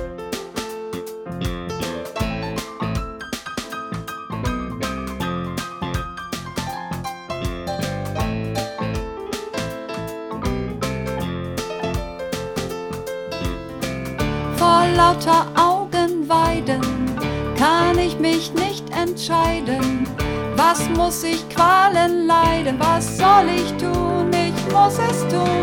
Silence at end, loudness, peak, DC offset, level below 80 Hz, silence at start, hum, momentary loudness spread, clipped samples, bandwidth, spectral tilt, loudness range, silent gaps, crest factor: 0 s; -21 LUFS; -2 dBFS; under 0.1%; -36 dBFS; 0 s; none; 14 LU; under 0.1%; 19 kHz; -5 dB/octave; 11 LU; none; 18 dB